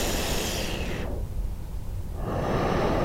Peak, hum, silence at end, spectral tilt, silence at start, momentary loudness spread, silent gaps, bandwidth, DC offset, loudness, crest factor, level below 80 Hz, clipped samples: -14 dBFS; none; 0 s; -4.5 dB/octave; 0 s; 11 LU; none; 16 kHz; under 0.1%; -30 LUFS; 14 dB; -32 dBFS; under 0.1%